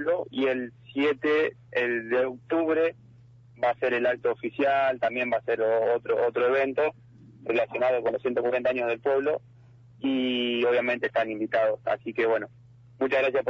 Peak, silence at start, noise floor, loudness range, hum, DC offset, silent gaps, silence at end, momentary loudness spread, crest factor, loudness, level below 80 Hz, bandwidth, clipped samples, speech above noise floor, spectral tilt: -14 dBFS; 0 s; -53 dBFS; 2 LU; 50 Hz at -65 dBFS; under 0.1%; none; 0 s; 5 LU; 14 dB; -26 LUFS; -68 dBFS; 6.8 kHz; under 0.1%; 27 dB; -6.5 dB/octave